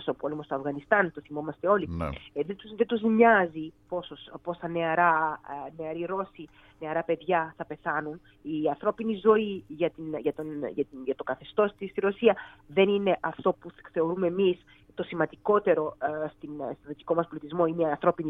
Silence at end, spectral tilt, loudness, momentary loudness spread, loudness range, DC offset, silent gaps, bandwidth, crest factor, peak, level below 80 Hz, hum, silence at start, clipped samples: 0 s; -8.5 dB/octave; -28 LUFS; 14 LU; 4 LU; under 0.1%; none; 4.1 kHz; 22 dB; -6 dBFS; -58 dBFS; none; 0 s; under 0.1%